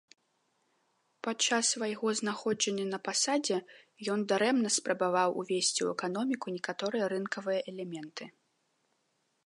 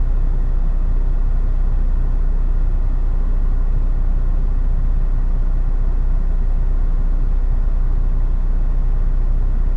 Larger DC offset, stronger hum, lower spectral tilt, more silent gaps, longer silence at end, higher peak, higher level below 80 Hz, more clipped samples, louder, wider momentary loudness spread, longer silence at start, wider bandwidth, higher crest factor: neither; neither; second, -2.5 dB/octave vs -9.5 dB/octave; neither; first, 1.15 s vs 0 s; second, -14 dBFS vs -8 dBFS; second, -86 dBFS vs -14 dBFS; neither; second, -31 LUFS vs -23 LUFS; first, 12 LU vs 1 LU; first, 1.25 s vs 0 s; first, 11.5 kHz vs 2 kHz; first, 18 dB vs 8 dB